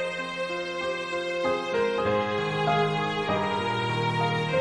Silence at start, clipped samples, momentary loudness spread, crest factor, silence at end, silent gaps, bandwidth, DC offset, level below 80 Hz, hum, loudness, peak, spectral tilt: 0 s; under 0.1%; 5 LU; 14 dB; 0 s; none; 11 kHz; under 0.1%; -62 dBFS; none; -27 LUFS; -12 dBFS; -5.5 dB/octave